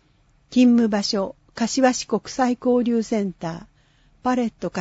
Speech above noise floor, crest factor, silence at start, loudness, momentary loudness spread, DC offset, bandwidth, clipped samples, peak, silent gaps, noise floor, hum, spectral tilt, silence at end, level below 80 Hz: 39 dB; 16 dB; 0.5 s; -21 LUFS; 12 LU; under 0.1%; 8 kHz; under 0.1%; -6 dBFS; none; -59 dBFS; none; -4.5 dB/octave; 0 s; -56 dBFS